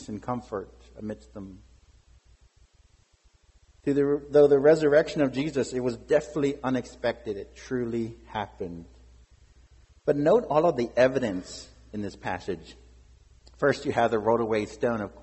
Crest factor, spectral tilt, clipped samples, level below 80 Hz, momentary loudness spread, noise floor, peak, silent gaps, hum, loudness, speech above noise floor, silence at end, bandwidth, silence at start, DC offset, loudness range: 20 dB; -6.5 dB/octave; under 0.1%; -54 dBFS; 18 LU; -62 dBFS; -8 dBFS; none; none; -26 LUFS; 36 dB; 0 s; 8.4 kHz; 0 s; under 0.1%; 11 LU